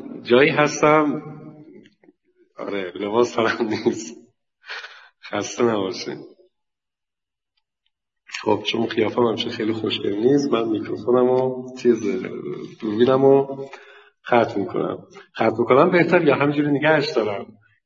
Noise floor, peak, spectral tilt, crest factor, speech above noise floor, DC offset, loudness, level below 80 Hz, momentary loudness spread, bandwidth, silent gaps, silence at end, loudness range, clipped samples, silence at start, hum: -89 dBFS; -2 dBFS; -5.5 dB/octave; 20 dB; 69 dB; under 0.1%; -20 LUFS; -66 dBFS; 18 LU; 7.6 kHz; none; 0.4 s; 9 LU; under 0.1%; 0 s; none